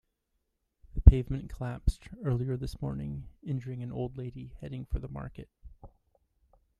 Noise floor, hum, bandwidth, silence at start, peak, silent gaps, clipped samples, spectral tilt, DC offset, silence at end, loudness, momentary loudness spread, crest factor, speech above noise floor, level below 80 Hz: -80 dBFS; none; 10.5 kHz; 0.95 s; -2 dBFS; none; under 0.1%; -9 dB/octave; under 0.1%; 0.9 s; -32 LUFS; 20 LU; 30 dB; 45 dB; -34 dBFS